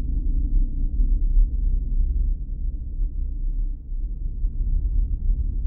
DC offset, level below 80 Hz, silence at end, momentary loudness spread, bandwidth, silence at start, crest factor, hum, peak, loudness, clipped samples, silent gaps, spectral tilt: under 0.1%; -22 dBFS; 0 s; 8 LU; 0.6 kHz; 0 s; 12 dB; none; -8 dBFS; -28 LUFS; under 0.1%; none; -15 dB/octave